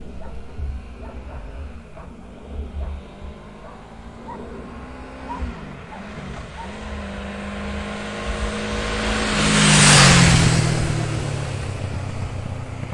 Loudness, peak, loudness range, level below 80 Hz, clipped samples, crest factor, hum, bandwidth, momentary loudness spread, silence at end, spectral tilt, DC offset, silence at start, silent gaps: -18 LUFS; 0 dBFS; 21 LU; -34 dBFS; under 0.1%; 22 dB; none; 11.5 kHz; 25 LU; 0 s; -3.5 dB/octave; under 0.1%; 0 s; none